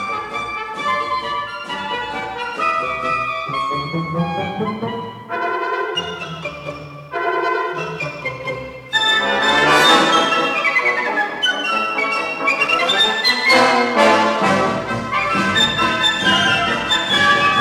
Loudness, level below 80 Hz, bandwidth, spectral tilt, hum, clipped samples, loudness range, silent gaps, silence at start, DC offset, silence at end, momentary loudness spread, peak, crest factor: -17 LUFS; -50 dBFS; 19.5 kHz; -3 dB/octave; none; under 0.1%; 8 LU; none; 0 s; under 0.1%; 0 s; 13 LU; -2 dBFS; 16 dB